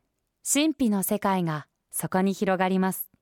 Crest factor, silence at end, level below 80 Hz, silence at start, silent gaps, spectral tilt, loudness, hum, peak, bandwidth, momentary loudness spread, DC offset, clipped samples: 16 dB; 0.15 s; -64 dBFS; 0.45 s; none; -4.5 dB/octave; -26 LUFS; none; -10 dBFS; 18 kHz; 9 LU; under 0.1%; under 0.1%